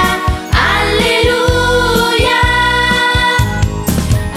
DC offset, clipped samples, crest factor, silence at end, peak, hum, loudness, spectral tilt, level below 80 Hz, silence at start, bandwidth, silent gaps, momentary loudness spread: under 0.1%; under 0.1%; 12 dB; 0 s; 0 dBFS; none; -11 LUFS; -4.5 dB/octave; -22 dBFS; 0 s; 16.5 kHz; none; 5 LU